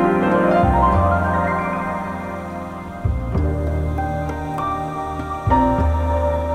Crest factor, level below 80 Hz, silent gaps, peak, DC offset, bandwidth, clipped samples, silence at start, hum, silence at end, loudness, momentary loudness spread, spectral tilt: 16 dB; -26 dBFS; none; -4 dBFS; under 0.1%; 10 kHz; under 0.1%; 0 s; none; 0 s; -20 LUFS; 11 LU; -8.5 dB/octave